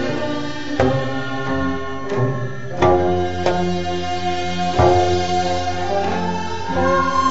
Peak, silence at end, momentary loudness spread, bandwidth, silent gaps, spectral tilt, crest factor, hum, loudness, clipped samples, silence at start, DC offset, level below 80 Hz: 0 dBFS; 0 s; 9 LU; 8 kHz; none; -6 dB/octave; 18 dB; none; -20 LUFS; under 0.1%; 0 s; 4%; -40 dBFS